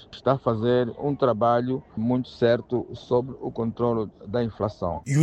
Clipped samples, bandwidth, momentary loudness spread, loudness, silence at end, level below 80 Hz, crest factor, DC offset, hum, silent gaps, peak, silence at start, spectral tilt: under 0.1%; 8.8 kHz; 8 LU; -25 LUFS; 0 s; -54 dBFS; 18 dB; under 0.1%; none; none; -6 dBFS; 0 s; -7.5 dB/octave